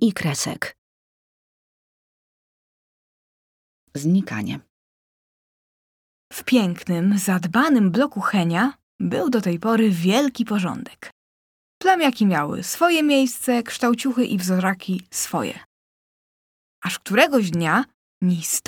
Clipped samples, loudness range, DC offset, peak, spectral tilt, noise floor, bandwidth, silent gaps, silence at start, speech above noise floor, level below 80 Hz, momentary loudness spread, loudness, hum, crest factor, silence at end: under 0.1%; 9 LU; under 0.1%; -2 dBFS; -5 dB/octave; under -90 dBFS; 19.5 kHz; 0.78-3.87 s, 4.70-6.31 s, 8.83-8.99 s, 11.12-11.81 s, 15.66-16.82 s, 17.94-18.21 s; 0 s; over 70 dB; -66 dBFS; 12 LU; -21 LUFS; none; 20 dB; 0.1 s